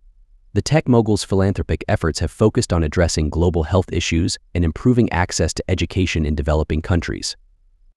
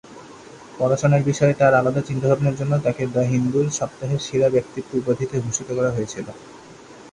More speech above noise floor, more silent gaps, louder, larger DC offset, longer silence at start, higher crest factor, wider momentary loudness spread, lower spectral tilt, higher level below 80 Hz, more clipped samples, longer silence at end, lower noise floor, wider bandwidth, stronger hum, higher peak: first, 35 dB vs 23 dB; neither; about the same, -19 LUFS vs -21 LUFS; neither; first, 0.55 s vs 0.1 s; about the same, 16 dB vs 16 dB; second, 6 LU vs 10 LU; about the same, -5.5 dB/octave vs -6 dB/octave; first, -30 dBFS vs -54 dBFS; neither; first, 0.65 s vs 0.05 s; first, -53 dBFS vs -43 dBFS; first, 12 kHz vs 10.5 kHz; neither; about the same, -2 dBFS vs -4 dBFS